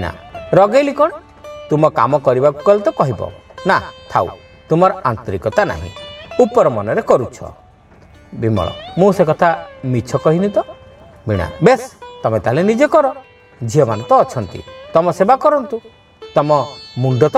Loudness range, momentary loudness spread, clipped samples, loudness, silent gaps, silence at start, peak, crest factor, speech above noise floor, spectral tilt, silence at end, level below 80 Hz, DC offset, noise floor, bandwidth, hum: 3 LU; 16 LU; under 0.1%; -15 LUFS; none; 0 s; 0 dBFS; 16 dB; 30 dB; -7 dB/octave; 0 s; -44 dBFS; under 0.1%; -44 dBFS; 13 kHz; none